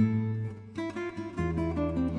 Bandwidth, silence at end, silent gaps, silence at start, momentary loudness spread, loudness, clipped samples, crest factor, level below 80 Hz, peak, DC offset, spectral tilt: 10 kHz; 0 s; none; 0 s; 7 LU; -33 LUFS; under 0.1%; 16 dB; -46 dBFS; -14 dBFS; under 0.1%; -8.5 dB/octave